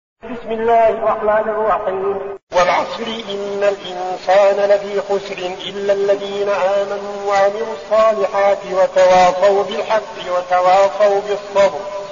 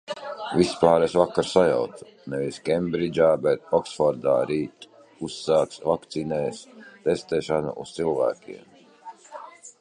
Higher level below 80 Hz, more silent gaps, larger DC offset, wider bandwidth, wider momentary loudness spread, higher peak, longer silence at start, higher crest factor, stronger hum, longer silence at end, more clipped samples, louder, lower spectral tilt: first, -50 dBFS vs -56 dBFS; first, 2.43-2.47 s vs none; first, 0.2% vs under 0.1%; second, 7.4 kHz vs 11 kHz; second, 11 LU vs 21 LU; about the same, -2 dBFS vs -2 dBFS; first, 0.25 s vs 0.1 s; second, 12 dB vs 22 dB; neither; about the same, 0 s vs 0.1 s; neither; first, -16 LUFS vs -24 LUFS; second, -2 dB/octave vs -5.5 dB/octave